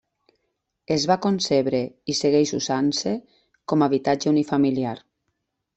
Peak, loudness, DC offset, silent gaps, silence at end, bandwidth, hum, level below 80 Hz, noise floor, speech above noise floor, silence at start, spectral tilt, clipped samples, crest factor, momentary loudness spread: -6 dBFS; -22 LUFS; under 0.1%; none; 0.8 s; 8.4 kHz; none; -62 dBFS; -77 dBFS; 55 dB; 0.9 s; -5 dB/octave; under 0.1%; 18 dB; 8 LU